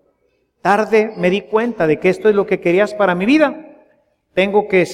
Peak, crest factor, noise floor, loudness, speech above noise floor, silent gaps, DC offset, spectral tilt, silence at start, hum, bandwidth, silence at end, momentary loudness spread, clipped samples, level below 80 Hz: -2 dBFS; 14 dB; -63 dBFS; -15 LUFS; 49 dB; none; under 0.1%; -6.5 dB/octave; 0.65 s; none; 12 kHz; 0 s; 5 LU; under 0.1%; -54 dBFS